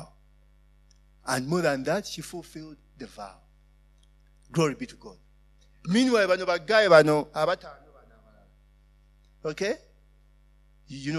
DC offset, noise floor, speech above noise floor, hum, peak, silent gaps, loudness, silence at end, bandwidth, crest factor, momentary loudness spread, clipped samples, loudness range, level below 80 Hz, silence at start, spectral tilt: under 0.1%; -58 dBFS; 33 dB; none; -4 dBFS; none; -25 LUFS; 0 s; 13.5 kHz; 24 dB; 26 LU; under 0.1%; 12 LU; -58 dBFS; 0 s; -5 dB/octave